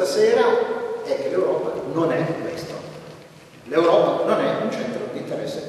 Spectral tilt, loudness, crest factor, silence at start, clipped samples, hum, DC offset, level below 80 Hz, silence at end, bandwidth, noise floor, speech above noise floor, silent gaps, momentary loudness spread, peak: -5.5 dB/octave; -22 LUFS; 18 dB; 0 s; under 0.1%; none; under 0.1%; -64 dBFS; 0 s; 12.5 kHz; -45 dBFS; 25 dB; none; 15 LU; -4 dBFS